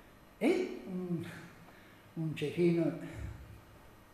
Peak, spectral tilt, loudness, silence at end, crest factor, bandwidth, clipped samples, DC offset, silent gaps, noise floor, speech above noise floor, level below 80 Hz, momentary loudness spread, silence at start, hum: -18 dBFS; -7.5 dB/octave; -35 LUFS; 0.1 s; 18 dB; 14 kHz; under 0.1%; under 0.1%; none; -57 dBFS; 24 dB; -58 dBFS; 24 LU; 0 s; none